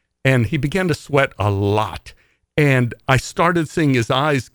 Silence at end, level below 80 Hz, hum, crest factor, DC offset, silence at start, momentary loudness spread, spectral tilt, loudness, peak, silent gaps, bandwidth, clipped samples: 0.1 s; -44 dBFS; none; 18 dB; under 0.1%; 0.25 s; 4 LU; -6 dB/octave; -18 LUFS; 0 dBFS; none; 19.5 kHz; under 0.1%